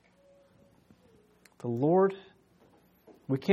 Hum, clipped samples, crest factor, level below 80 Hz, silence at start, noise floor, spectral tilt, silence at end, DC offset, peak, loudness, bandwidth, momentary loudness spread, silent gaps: none; under 0.1%; 22 dB; -76 dBFS; 1.65 s; -63 dBFS; -9 dB/octave; 0 s; under 0.1%; -10 dBFS; -29 LUFS; 12.5 kHz; 22 LU; none